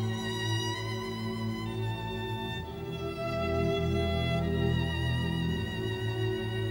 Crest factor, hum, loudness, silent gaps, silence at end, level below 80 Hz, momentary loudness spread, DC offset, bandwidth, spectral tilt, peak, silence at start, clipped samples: 14 dB; none; -32 LUFS; none; 0 s; -48 dBFS; 6 LU; under 0.1%; 19 kHz; -6 dB/octave; -18 dBFS; 0 s; under 0.1%